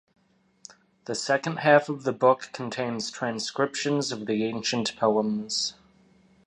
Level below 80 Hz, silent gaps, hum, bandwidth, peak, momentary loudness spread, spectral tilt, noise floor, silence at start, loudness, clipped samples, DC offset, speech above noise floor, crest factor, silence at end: -70 dBFS; none; none; 11 kHz; -6 dBFS; 10 LU; -4 dB/octave; -59 dBFS; 1.1 s; -26 LUFS; under 0.1%; under 0.1%; 34 dB; 22 dB; 0.75 s